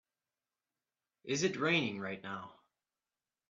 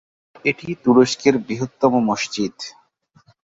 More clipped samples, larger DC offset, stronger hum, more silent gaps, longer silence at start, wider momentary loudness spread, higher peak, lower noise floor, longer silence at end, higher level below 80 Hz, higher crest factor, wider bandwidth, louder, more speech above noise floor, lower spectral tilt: neither; neither; neither; neither; first, 1.25 s vs 0.45 s; first, 18 LU vs 12 LU; second, -18 dBFS vs -2 dBFS; first, under -90 dBFS vs -57 dBFS; first, 0.95 s vs 0.8 s; second, -80 dBFS vs -60 dBFS; about the same, 22 dB vs 18 dB; about the same, 7.8 kHz vs 7.8 kHz; second, -35 LUFS vs -19 LUFS; first, over 55 dB vs 38 dB; second, -3.5 dB/octave vs -5 dB/octave